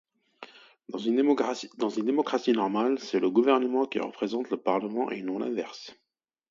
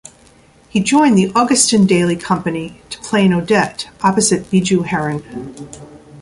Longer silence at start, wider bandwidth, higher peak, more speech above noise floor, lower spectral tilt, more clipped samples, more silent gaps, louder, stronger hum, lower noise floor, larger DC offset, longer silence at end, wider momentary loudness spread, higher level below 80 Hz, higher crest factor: second, 0.4 s vs 0.75 s; second, 7.6 kHz vs 11.5 kHz; second, -8 dBFS vs 0 dBFS; second, 24 dB vs 33 dB; about the same, -5.5 dB/octave vs -4.5 dB/octave; neither; neither; second, -28 LUFS vs -15 LUFS; neither; first, -51 dBFS vs -47 dBFS; neither; first, 0.55 s vs 0 s; about the same, 16 LU vs 18 LU; second, -78 dBFS vs -50 dBFS; about the same, 20 dB vs 16 dB